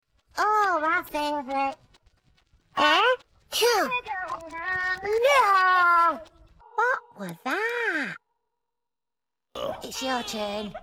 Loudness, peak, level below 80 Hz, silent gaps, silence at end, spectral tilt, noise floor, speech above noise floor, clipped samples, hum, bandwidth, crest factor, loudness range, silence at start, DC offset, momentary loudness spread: -24 LUFS; -6 dBFS; -60 dBFS; none; 0 s; -2 dB/octave; under -90 dBFS; over 62 dB; under 0.1%; none; 16.5 kHz; 20 dB; 8 LU; 0.35 s; under 0.1%; 15 LU